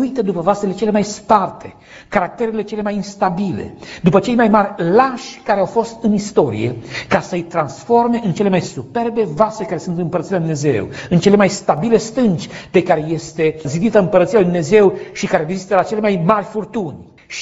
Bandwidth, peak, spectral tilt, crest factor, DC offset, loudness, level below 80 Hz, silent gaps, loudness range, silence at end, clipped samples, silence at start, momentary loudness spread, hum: 8 kHz; 0 dBFS; -6.5 dB/octave; 16 dB; under 0.1%; -16 LUFS; -48 dBFS; none; 3 LU; 0 s; under 0.1%; 0 s; 10 LU; none